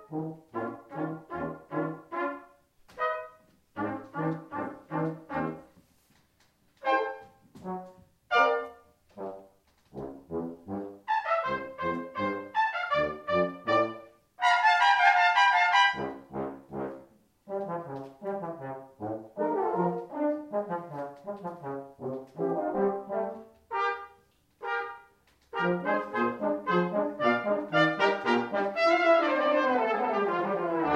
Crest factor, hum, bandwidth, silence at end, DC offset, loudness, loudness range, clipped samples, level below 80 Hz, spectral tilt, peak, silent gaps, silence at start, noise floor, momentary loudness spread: 22 dB; none; 12 kHz; 0 s; under 0.1%; -29 LUFS; 11 LU; under 0.1%; -68 dBFS; -5.5 dB/octave; -8 dBFS; none; 0 s; -67 dBFS; 17 LU